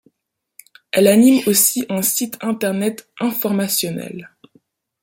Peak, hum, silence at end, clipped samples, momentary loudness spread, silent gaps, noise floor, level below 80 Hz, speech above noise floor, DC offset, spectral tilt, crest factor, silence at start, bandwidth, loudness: 0 dBFS; none; 0.75 s; under 0.1%; 12 LU; none; -77 dBFS; -62 dBFS; 60 dB; under 0.1%; -4 dB/octave; 18 dB; 0.95 s; 17 kHz; -16 LUFS